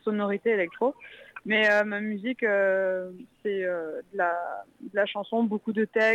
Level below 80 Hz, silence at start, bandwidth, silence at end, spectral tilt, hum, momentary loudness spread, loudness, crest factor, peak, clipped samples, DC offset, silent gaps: -78 dBFS; 0.05 s; 10 kHz; 0 s; -6 dB/octave; none; 13 LU; -27 LUFS; 16 dB; -12 dBFS; under 0.1%; under 0.1%; none